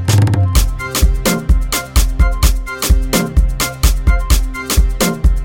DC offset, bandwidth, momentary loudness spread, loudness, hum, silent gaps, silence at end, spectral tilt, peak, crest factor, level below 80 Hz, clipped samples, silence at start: under 0.1%; 17.5 kHz; 3 LU; -15 LUFS; none; none; 0 s; -4.5 dB/octave; 0 dBFS; 12 dB; -14 dBFS; under 0.1%; 0 s